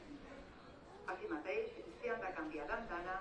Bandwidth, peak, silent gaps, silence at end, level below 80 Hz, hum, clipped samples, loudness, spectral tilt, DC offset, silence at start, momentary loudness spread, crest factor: 10 kHz; -28 dBFS; none; 0 s; -64 dBFS; none; under 0.1%; -44 LUFS; -5.5 dB/octave; under 0.1%; 0 s; 14 LU; 18 dB